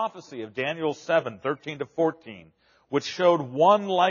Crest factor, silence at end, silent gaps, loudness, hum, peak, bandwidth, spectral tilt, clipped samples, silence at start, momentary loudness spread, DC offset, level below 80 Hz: 18 dB; 0 s; none; -25 LUFS; none; -6 dBFS; 7.2 kHz; -3.5 dB/octave; under 0.1%; 0 s; 14 LU; under 0.1%; -74 dBFS